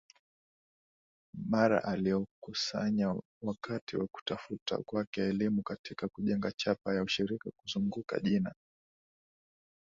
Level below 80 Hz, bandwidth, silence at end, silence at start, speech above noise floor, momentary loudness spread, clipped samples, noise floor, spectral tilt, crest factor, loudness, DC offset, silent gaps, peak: -66 dBFS; 7.6 kHz; 1.3 s; 1.35 s; over 57 dB; 9 LU; under 0.1%; under -90 dBFS; -6 dB/octave; 20 dB; -34 LUFS; under 0.1%; 2.31-2.42 s, 3.25-3.41 s, 3.81-3.87 s, 4.22-4.26 s, 4.61-4.66 s, 5.07-5.13 s, 5.79-5.84 s, 6.54-6.58 s; -14 dBFS